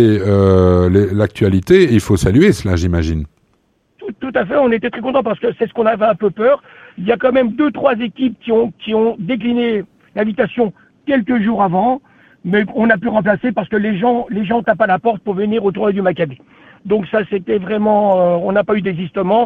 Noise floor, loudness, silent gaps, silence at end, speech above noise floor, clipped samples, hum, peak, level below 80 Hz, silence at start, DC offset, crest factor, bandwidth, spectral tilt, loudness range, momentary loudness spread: -60 dBFS; -15 LUFS; none; 0 s; 46 dB; under 0.1%; none; 0 dBFS; -38 dBFS; 0 s; under 0.1%; 14 dB; 13.5 kHz; -7.5 dB/octave; 3 LU; 9 LU